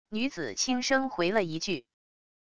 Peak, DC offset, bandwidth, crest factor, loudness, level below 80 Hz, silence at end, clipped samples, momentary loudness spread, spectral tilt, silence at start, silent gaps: -12 dBFS; 0.4%; 11 kHz; 20 dB; -29 LUFS; -64 dBFS; 0.65 s; under 0.1%; 7 LU; -3 dB/octave; 0.05 s; none